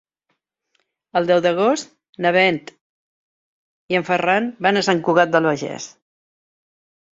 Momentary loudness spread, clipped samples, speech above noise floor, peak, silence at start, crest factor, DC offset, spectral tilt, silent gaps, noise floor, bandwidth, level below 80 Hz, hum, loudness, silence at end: 13 LU; under 0.1%; 55 dB; -2 dBFS; 1.15 s; 20 dB; under 0.1%; -4.5 dB/octave; 2.09-2.13 s, 2.81-3.89 s; -73 dBFS; 7.8 kHz; -64 dBFS; none; -18 LUFS; 1.25 s